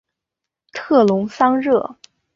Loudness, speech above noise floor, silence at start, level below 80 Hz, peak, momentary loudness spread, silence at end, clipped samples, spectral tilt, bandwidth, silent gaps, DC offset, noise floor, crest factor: -17 LUFS; 68 dB; 0.75 s; -62 dBFS; -2 dBFS; 17 LU; 0.45 s; under 0.1%; -7 dB/octave; 7.6 kHz; none; under 0.1%; -84 dBFS; 16 dB